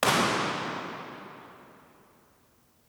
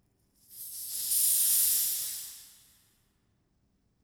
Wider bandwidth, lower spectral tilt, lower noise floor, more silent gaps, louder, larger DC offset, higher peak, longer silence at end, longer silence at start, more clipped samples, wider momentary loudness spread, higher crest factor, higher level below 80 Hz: about the same, over 20 kHz vs over 20 kHz; first, -3 dB/octave vs 3 dB/octave; second, -64 dBFS vs -73 dBFS; neither; second, -29 LUFS vs -25 LUFS; neither; first, -8 dBFS vs -14 dBFS; second, 1.15 s vs 1.55 s; second, 0 s vs 0.5 s; neither; first, 25 LU vs 19 LU; about the same, 24 dB vs 20 dB; first, -68 dBFS vs -74 dBFS